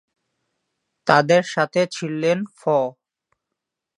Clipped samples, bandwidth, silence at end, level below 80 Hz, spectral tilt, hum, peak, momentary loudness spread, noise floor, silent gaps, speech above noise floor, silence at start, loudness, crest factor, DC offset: under 0.1%; 10.5 kHz; 1.05 s; -70 dBFS; -5 dB/octave; none; 0 dBFS; 8 LU; -83 dBFS; none; 63 dB; 1.05 s; -20 LUFS; 22 dB; under 0.1%